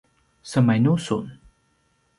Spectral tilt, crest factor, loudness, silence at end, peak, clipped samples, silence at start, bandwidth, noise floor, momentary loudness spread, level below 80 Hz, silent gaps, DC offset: -7 dB/octave; 18 dB; -22 LUFS; 0.85 s; -6 dBFS; under 0.1%; 0.45 s; 11.5 kHz; -66 dBFS; 10 LU; -58 dBFS; none; under 0.1%